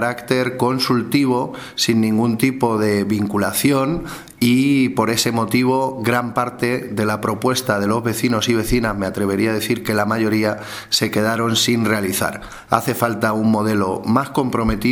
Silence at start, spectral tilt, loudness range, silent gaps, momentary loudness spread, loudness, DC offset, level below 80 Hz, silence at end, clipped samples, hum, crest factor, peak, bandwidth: 0 s; -5 dB/octave; 1 LU; none; 5 LU; -18 LUFS; under 0.1%; -42 dBFS; 0 s; under 0.1%; none; 18 dB; 0 dBFS; 19.5 kHz